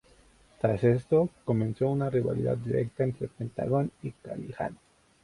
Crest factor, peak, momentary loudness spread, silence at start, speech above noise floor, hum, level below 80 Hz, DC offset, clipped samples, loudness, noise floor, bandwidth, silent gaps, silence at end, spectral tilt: 18 dB; -12 dBFS; 11 LU; 0.65 s; 31 dB; none; -56 dBFS; under 0.1%; under 0.1%; -29 LUFS; -60 dBFS; 11 kHz; none; 0.5 s; -9.5 dB/octave